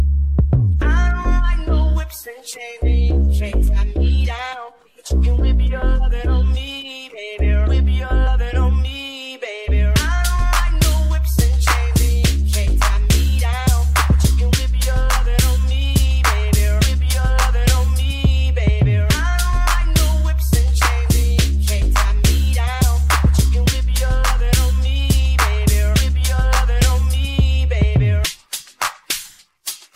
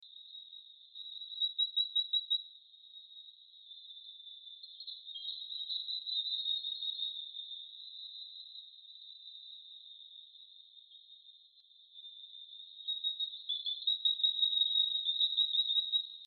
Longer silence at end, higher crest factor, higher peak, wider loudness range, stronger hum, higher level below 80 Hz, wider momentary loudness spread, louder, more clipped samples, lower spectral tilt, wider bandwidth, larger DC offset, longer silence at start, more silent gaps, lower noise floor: first, 0.2 s vs 0 s; second, 12 dB vs 20 dB; first, -4 dBFS vs -20 dBFS; second, 3 LU vs 20 LU; neither; first, -16 dBFS vs under -90 dBFS; second, 8 LU vs 24 LU; first, -17 LUFS vs -33 LUFS; neither; first, -4.5 dB/octave vs 8.5 dB/octave; first, 16.5 kHz vs 4.6 kHz; neither; about the same, 0 s vs 0 s; neither; second, -38 dBFS vs -63 dBFS